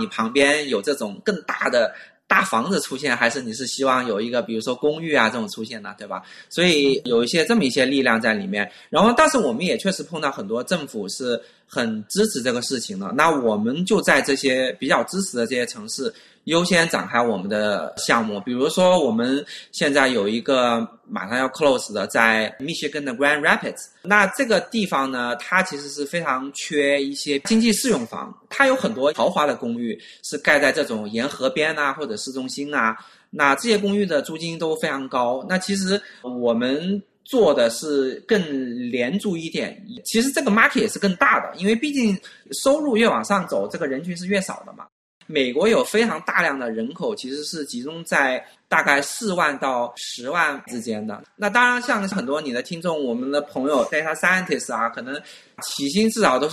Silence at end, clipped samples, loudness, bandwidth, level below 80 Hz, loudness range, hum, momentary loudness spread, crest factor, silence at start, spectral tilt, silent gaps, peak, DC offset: 0 s; under 0.1%; -21 LUFS; 13 kHz; -62 dBFS; 3 LU; none; 11 LU; 22 dB; 0 s; -4 dB/octave; 44.92-45.21 s; 0 dBFS; under 0.1%